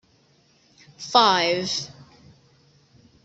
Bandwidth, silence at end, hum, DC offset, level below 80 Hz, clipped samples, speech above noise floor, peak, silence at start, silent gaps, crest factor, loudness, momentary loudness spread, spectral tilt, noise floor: 8.2 kHz; 1.2 s; none; under 0.1%; -68 dBFS; under 0.1%; 39 dB; -2 dBFS; 1 s; none; 24 dB; -20 LUFS; 21 LU; -2.5 dB/octave; -60 dBFS